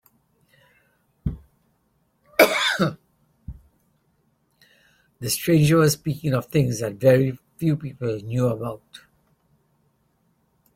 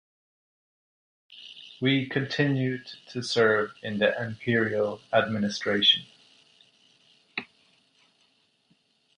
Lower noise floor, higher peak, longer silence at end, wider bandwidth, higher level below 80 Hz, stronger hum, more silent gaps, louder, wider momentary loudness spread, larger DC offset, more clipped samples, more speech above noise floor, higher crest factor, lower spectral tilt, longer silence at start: about the same, -67 dBFS vs -68 dBFS; first, 0 dBFS vs -8 dBFS; about the same, 1.8 s vs 1.75 s; first, 16.5 kHz vs 10.5 kHz; first, -50 dBFS vs -68 dBFS; neither; neither; first, -22 LUFS vs -26 LUFS; about the same, 16 LU vs 16 LU; neither; neither; first, 46 dB vs 42 dB; about the same, 24 dB vs 20 dB; about the same, -5.5 dB/octave vs -5 dB/octave; about the same, 1.25 s vs 1.3 s